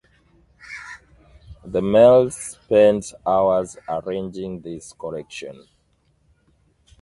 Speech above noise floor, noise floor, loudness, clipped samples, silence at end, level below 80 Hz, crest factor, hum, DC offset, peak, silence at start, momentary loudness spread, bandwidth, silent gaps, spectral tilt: 44 dB; -63 dBFS; -19 LUFS; under 0.1%; 1.5 s; -52 dBFS; 20 dB; none; under 0.1%; -2 dBFS; 0.7 s; 22 LU; 11.5 kHz; none; -5.5 dB/octave